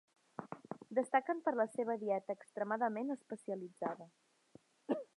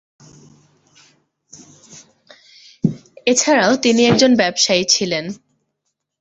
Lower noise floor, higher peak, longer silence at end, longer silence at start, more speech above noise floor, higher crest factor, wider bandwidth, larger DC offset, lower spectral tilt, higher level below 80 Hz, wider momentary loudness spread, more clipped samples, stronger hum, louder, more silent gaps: second, -66 dBFS vs -75 dBFS; second, -18 dBFS vs 0 dBFS; second, 0.1 s vs 0.85 s; second, 0.4 s vs 1.95 s; second, 28 dB vs 60 dB; about the same, 22 dB vs 18 dB; first, 11 kHz vs 8.2 kHz; neither; first, -6.5 dB/octave vs -3 dB/octave; second, under -90 dBFS vs -58 dBFS; first, 15 LU vs 10 LU; neither; neither; second, -39 LUFS vs -15 LUFS; neither